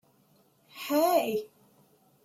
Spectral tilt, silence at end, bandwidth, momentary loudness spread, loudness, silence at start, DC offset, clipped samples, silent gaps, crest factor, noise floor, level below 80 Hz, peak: -3.5 dB/octave; 0.8 s; 16 kHz; 25 LU; -28 LUFS; 0.75 s; under 0.1%; under 0.1%; none; 18 dB; -65 dBFS; -82 dBFS; -14 dBFS